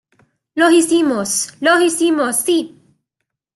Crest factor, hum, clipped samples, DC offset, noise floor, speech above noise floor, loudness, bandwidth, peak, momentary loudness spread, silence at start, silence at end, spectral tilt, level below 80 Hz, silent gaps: 14 dB; none; under 0.1%; under 0.1%; -78 dBFS; 63 dB; -15 LUFS; 12.5 kHz; -2 dBFS; 7 LU; 0.55 s; 0.9 s; -2 dB/octave; -66 dBFS; none